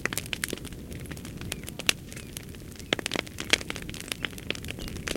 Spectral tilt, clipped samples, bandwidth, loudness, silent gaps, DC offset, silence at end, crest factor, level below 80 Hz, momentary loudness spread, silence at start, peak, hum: -2.5 dB/octave; under 0.1%; 17 kHz; -32 LUFS; none; under 0.1%; 0 s; 34 dB; -48 dBFS; 14 LU; 0 s; 0 dBFS; none